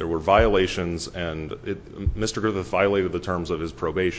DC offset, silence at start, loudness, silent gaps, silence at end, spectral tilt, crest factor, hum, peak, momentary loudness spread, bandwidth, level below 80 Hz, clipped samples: under 0.1%; 0 s; -24 LUFS; none; 0 s; -5.5 dB/octave; 20 dB; none; -4 dBFS; 12 LU; 8 kHz; -36 dBFS; under 0.1%